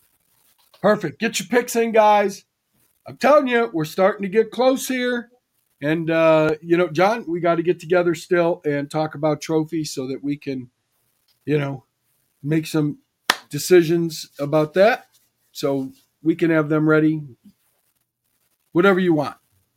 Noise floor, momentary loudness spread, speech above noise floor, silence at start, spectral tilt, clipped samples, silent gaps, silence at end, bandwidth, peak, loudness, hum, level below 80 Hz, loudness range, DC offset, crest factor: -70 dBFS; 11 LU; 51 dB; 0.85 s; -5.5 dB/octave; under 0.1%; none; 0.45 s; 16.5 kHz; 0 dBFS; -20 LUFS; none; -66 dBFS; 6 LU; under 0.1%; 20 dB